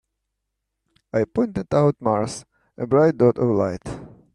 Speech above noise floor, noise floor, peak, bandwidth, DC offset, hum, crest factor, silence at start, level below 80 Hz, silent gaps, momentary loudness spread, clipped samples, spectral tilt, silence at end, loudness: 59 dB; -79 dBFS; -6 dBFS; 11 kHz; under 0.1%; none; 18 dB; 1.15 s; -52 dBFS; none; 15 LU; under 0.1%; -7.5 dB/octave; 0.25 s; -21 LUFS